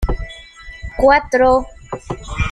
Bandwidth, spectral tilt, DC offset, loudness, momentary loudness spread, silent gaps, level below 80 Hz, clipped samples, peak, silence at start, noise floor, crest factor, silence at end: 11 kHz; -6 dB/octave; under 0.1%; -15 LUFS; 21 LU; none; -28 dBFS; under 0.1%; -2 dBFS; 0 s; -37 dBFS; 16 dB; 0 s